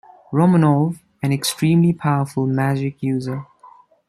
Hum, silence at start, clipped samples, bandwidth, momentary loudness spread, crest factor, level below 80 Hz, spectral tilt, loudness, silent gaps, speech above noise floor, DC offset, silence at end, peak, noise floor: none; 0.3 s; under 0.1%; 15 kHz; 9 LU; 16 dB; -58 dBFS; -6.5 dB/octave; -19 LUFS; none; 31 dB; under 0.1%; 0.4 s; -4 dBFS; -48 dBFS